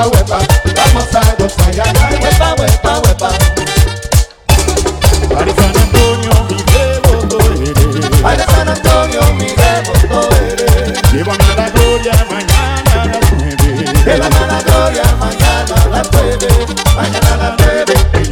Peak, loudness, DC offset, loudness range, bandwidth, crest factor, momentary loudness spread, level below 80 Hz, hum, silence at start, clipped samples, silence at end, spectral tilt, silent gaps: 0 dBFS; -10 LUFS; under 0.1%; 1 LU; 20 kHz; 10 dB; 2 LU; -14 dBFS; none; 0 s; 2%; 0 s; -5 dB/octave; none